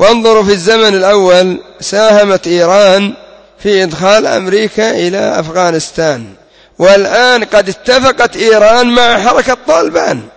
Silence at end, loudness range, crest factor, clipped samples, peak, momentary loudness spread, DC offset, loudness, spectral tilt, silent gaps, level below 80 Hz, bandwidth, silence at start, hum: 0.1 s; 4 LU; 8 dB; 0.8%; 0 dBFS; 7 LU; under 0.1%; -8 LUFS; -3.5 dB/octave; none; -42 dBFS; 8 kHz; 0 s; none